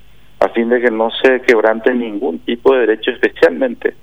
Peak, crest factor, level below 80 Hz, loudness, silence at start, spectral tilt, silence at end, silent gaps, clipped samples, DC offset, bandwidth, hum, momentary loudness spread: 0 dBFS; 14 dB; -50 dBFS; -14 LUFS; 0.4 s; -5 dB/octave; 0.1 s; none; under 0.1%; 1%; 9.8 kHz; none; 7 LU